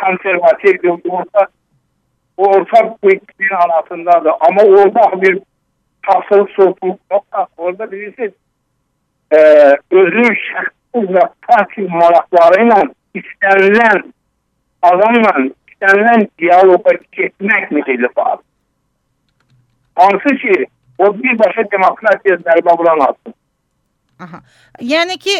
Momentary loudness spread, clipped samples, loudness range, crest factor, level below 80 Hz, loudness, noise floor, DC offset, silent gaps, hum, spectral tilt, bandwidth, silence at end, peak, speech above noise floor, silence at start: 13 LU; 0.2%; 5 LU; 12 dB; -62 dBFS; -11 LUFS; -65 dBFS; under 0.1%; none; none; -5.5 dB/octave; 9 kHz; 0 s; 0 dBFS; 55 dB; 0 s